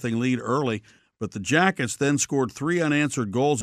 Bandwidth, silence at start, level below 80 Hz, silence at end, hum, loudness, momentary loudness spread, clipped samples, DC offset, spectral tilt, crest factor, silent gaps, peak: 15 kHz; 0 s; -62 dBFS; 0 s; none; -24 LUFS; 10 LU; under 0.1%; under 0.1%; -4.5 dB/octave; 18 dB; none; -6 dBFS